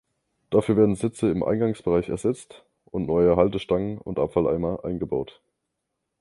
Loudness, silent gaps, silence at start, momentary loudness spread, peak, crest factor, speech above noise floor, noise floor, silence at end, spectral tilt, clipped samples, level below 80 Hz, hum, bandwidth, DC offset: -24 LUFS; none; 0.5 s; 10 LU; -4 dBFS; 20 dB; 57 dB; -80 dBFS; 0.9 s; -7.5 dB/octave; under 0.1%; -48 dBFS; none; 11.5 kHz; under 0.1%